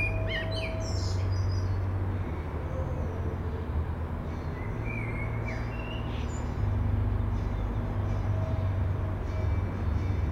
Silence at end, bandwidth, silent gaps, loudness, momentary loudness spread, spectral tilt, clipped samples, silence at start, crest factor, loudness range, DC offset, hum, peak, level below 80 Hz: 0 s; 8 kHz; none; -32 LUFS; 5 LU; -7 dB/octave; under 0.1%; 0 s; 12 dB; 3 LU; under 0.1%; none; -18 dBFS; -34 dBFS